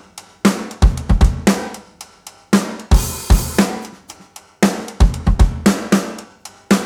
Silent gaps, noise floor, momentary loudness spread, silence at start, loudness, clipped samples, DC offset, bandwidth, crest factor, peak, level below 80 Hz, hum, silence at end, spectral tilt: none; -43 dBFS; 21 LU; 0.15 s; -17 LUFS; under 0.1%; under 0.1%; over 20 kHz; 16 dB; 0 dBFS; -20 dBFS; none; 0 s; -5.5 dB/octave